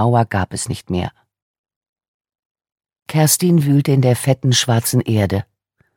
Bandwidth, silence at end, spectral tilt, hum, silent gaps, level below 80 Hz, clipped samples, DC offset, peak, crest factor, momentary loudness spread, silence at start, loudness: 17.5 kHz; 0.55 s; -5 dB/octave; none; 1.42-1.64 s, 1.76-1.81 s, 1.89-1.96 s, 2.08-2.20 s, 2.39-2.55 s, 2.72-2.76 s, 3.02-3.06 s; -50 dBFS; under 0.1%; under 0.1%; 0 dBFS; 16 dB; 10 LU; 0 s; -16 LUFS